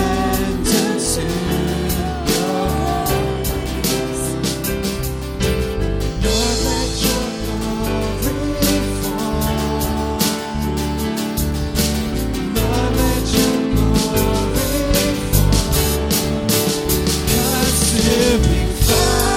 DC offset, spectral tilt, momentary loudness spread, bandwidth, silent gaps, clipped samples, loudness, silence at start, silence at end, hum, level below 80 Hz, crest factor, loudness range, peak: under 0.1%; -4.5 dB/octave; 6 LU; 17.5 kHz; none; under 0.1%; -18 LUFS; 0 s; 0 s; none; -24 dBFS; 16 dB; 4 LU; 0 dBFS